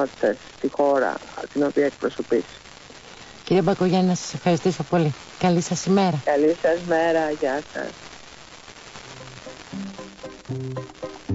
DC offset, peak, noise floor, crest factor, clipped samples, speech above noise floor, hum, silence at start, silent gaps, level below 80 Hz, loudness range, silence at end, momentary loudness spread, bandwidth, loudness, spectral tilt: under 0.1%; -8 dBFS; -44 dBFS; 16 dB; under 0.1%; 22 dB; none; 0 s; none; -56 dBFS; 13 LU; 0 s; 21 LU; 8 kHz; -23 LUFS; -6 dB/octave